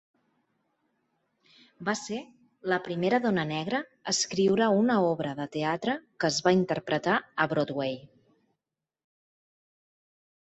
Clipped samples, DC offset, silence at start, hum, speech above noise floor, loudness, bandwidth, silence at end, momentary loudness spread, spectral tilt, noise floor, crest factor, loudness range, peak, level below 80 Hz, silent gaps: under 0.1%; under 0.1%; 1.8 s; none; 60 dB; -28 LUFS; 8.2 kHz; 2.35 s; 9 LU; -4.5 dB/octave; -88 dBFS; 20 dB; 6 LU; -10 dBFS; -70 dBFS; none